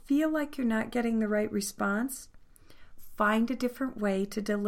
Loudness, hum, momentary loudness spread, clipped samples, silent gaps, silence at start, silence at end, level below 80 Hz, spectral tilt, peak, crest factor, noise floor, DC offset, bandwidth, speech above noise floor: -30 LUFS; none; 5 LU; under 0.1%; none; 0.05 s; 0 s; -54 dBFS; -5 dB/octave; -14 dBFS; 16 dB; -51 dBFS; under 0.1%; 16.5 kHz; 22 dB